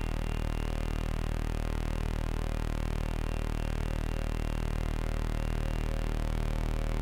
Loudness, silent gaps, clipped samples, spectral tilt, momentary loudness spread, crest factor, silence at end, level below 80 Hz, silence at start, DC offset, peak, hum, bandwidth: -35 LUFS; none; under 0.1%; -6.5 dB/octave; 1 LU; 12 dB; 0 s; -32 dBFS; 0 s; under 0.1%; -20 dBFS; none; 15.5 kHz